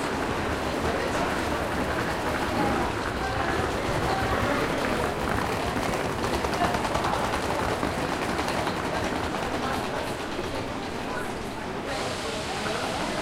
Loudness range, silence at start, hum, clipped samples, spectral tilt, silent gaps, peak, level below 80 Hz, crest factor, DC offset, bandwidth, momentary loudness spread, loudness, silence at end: 4 LU; 0 s; none; under 0.1%; -4.5 dB/octave; none; -10 dBFS; -40 dBFS; 16 dB; under 0.1%; 16.5 kHz; 6 LU; -28 LUFS; 0 s